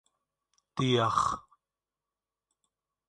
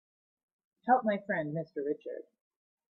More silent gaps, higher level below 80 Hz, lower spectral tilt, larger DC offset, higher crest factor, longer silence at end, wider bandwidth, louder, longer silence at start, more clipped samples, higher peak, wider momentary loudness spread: neither; first, -62 dBFS vs -80 dBFS; second, -5 dB/octave vs -10 dB/octave; neither; about the same, 22 dB vs 22 dB; first, 1.7 s vs 0.7 s; first, 11 kHz vs 5.6 kHz; first, -28 LUFS vs -33 LUFS; about the same, 0.75 s vs 0.85 s; neither; about the same, -12 dBFS vs -14 dBFS; about the same, 14 LU vs 15 LU